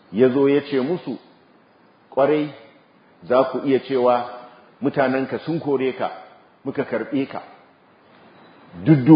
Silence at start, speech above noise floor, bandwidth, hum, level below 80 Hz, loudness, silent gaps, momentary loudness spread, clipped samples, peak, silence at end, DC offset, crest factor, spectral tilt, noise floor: 0.1 s; 35 dB; 5.2 kHz; none; -64 dBFS; -21 LUFS; none; 14 LU; under 0.1%; -2 dBFS; 0 s; under 0.1%; 20 dB; -12 dB/octave; -54 dBFS